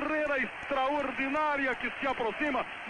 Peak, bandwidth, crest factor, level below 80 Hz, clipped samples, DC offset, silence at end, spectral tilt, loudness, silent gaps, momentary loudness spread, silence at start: -20 dBFS; 9.8 kHz; 12 dB; -58 dBFS; under 0.1%; under 0.1%; 0 s; -4.5 dB/octave; -30 LUFS; none; 3 LU; 0 s